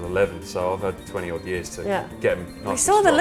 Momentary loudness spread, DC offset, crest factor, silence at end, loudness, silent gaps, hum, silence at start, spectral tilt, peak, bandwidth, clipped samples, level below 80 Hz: 12 LU; 0.1%; 18 dB; 0 s; -24 LUFS; none; none; 0 s; -3.5 dB/octave; -4 dBFS; 15.5 kHz; under 0.1%; -46 dBFS